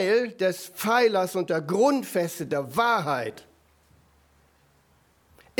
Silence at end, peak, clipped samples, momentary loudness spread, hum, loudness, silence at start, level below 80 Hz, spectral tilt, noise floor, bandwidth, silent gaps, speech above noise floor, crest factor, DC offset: 2.2 s; -8 dBFS; under 0.1%; 8 LU; none; -25 LUFS; 0 s; -68 dBFS; -4.5 dB/octave; -63 dBFS; over 20 kHz; none; 38 dB; 18 dB; under 0.1%